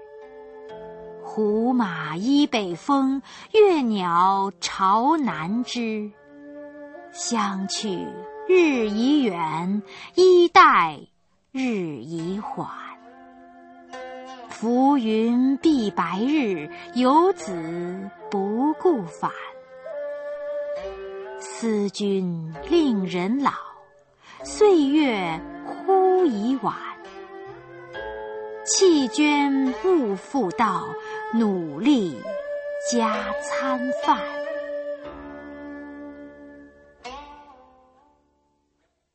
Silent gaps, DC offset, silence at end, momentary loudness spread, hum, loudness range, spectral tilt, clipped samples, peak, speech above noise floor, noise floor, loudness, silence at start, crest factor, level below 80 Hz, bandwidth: none; under 0.1%; 1.65 s; 21 LU; none; 9 LU; -4.5 dB/octave; under 0.1%; 0 dBFS; 50 dB; -71 dBFS; -22 LUFS; 0 s; 22 dB; -60 dBFS; 8.8 kHz